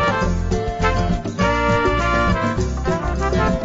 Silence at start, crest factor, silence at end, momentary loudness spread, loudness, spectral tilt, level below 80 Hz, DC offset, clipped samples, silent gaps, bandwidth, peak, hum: 0 s; 14 dB; 0 s; 5 LU; -19 LUFS; -6 dB/octave; -26 dBFS; under 0.1%; under 0.1%; none; 8 kHz; -4 dBFS; none